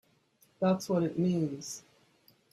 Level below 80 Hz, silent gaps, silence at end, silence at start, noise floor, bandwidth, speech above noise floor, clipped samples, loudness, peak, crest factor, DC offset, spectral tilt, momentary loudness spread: -72 dBFS; none; 0.75 s; 0.6 s; -68 dBFS; 14 kHz; 38 dB; under 0.1%; -31 LUFS; -16 dBFS; 18 dB; under 0.1%; -6.5 dB/octave; 13 LU